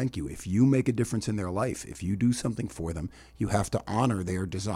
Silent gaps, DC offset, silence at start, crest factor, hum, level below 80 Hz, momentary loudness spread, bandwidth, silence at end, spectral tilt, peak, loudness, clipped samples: none; under 0.1%; 0 s; 20 dB; none; -48 dBFS; 11 LU; 15 kHz; 0 s; -6.5 dB/octave; -10 dBFS; -29 LUFS; under 0.1%